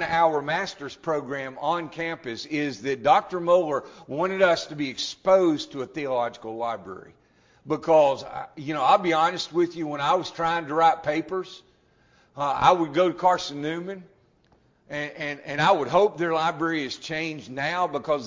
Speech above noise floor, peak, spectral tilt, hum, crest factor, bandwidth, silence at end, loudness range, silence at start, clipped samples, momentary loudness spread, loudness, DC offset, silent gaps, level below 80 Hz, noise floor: 38 dB; -2 dBFS; -5 dB/octave; none; 22 dB; 7.6 kHz; 0 s; 3 LU; 0 s; under 0.1%; 13 LU; -24 LUFS; under 0.1%; none; -62 dBFS; -62 dBFS